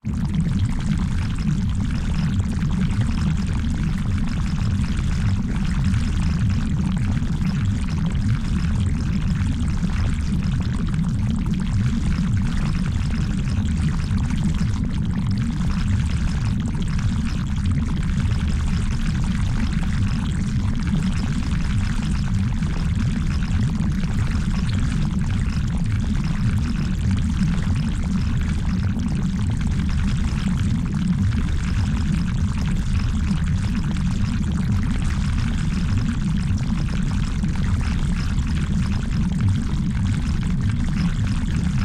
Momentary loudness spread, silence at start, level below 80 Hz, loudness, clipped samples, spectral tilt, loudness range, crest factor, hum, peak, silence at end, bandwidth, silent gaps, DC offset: 2 LU; 0.05 s; -26 dBFS; -23 LUFS; under 0.1%; -7 dB/octave; 1 LU; 12 dB; none; -10 dBFS; 0 s; 11 kHz; none; under 0.1%